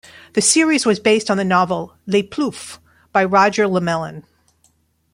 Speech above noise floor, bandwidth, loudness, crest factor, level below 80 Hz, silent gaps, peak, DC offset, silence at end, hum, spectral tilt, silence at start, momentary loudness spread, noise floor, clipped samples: 44 dB; 16 kHz; -17 LUFS; 16 dB; -58 dBFS; none; -2 dBFS; under 0.1%; 0.9 s; none; -3.5 dB/octave; 0.35 s; 10 LU; -60 dBFS; under 0.1%